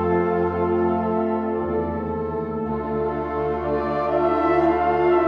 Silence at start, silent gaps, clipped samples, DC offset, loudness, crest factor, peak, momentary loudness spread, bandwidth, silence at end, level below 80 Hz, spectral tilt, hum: 0 s; none; under 0.1%; under 0.1%; -22 LUFS; 14 dB; -8 dBFS; 7 LU; 5.2 kHz; 0 s; -44 dBFS; -9.5 dB/octave; none